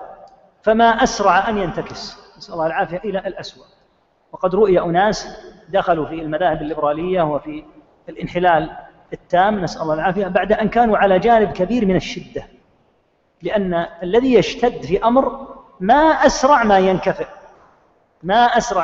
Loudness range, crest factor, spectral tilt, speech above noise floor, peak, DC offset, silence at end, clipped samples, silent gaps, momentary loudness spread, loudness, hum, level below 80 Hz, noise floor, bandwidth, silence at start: 5 LU; 18 dB; -5.5 dB/octave; 44 dB; 0 dBFS; under 0.1%; 0 s; under 0.1%; none; 18 LU; -17 LUFS; none; -42 dBFS; -61 dBFS; 7.8 kHz; 0 s